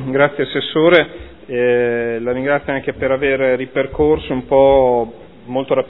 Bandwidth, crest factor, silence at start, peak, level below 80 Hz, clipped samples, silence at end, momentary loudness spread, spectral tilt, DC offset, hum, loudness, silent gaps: 4.1 kHz; 16 dB; 0 s; 0 dBFS; -40 dBFS; under 0.1%; 0 s; 11 LU; -9 dB/octave; 0.5%; none; -16 LUFS; none